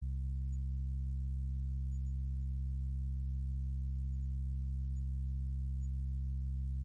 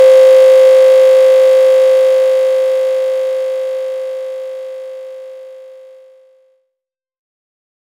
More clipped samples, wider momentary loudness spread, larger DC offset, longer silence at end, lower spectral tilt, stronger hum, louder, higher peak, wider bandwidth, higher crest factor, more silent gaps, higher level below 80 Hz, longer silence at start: neither; second, 0 LU vs 21 LU; neither; second, 0 s vs 2.35 s; first, -9.5 dB/octave vs 1 dB/octave; neither; second, -40 LUFS vs -9 LUFS; second, -30 dBFS vs 0 dBFS; second, 0.5 kHz vs 14 kHz; about the same, 6 dB vs 10 dB; neither; first, -38 dBFS vs under -90 dBFS; about the same, 0 s vs 0 s